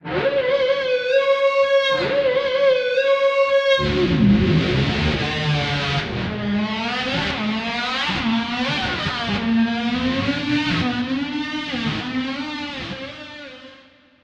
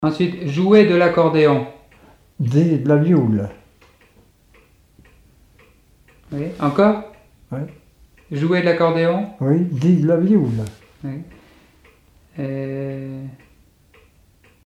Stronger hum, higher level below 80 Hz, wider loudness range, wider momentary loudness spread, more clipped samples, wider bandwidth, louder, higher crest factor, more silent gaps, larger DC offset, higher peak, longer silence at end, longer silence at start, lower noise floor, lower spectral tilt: neither; first, -40 dBFS vs -54 dBFS; second, 6 LU vs 15 LU; second, 8 LU vs 18 LU; neither; about the same, 8.8 kHz vs 9.2 kHz; about the same, -20 LUFS vs -18 LUFS; about the same, 14 dB vs 18 dB; neither; neither; second, -6 dBFS vs -2 dBFS; second, 0.5 s vs 1.3 s; about the same, 0.05 s vs 0 s; second, -50 dBFS vs -54 dBFS; second, -6 dB/octave vs -8.5 dB/octave